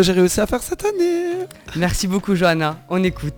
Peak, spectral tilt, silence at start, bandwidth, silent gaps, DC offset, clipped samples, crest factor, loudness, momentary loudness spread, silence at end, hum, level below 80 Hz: -4 dBFS; -5 dB/octave; 0 s; over 20 kHz; none; under 0.1%; under 0.1%; 14 dB; -19 LUFS; 6 LU; 0 s; none; -36 dBFS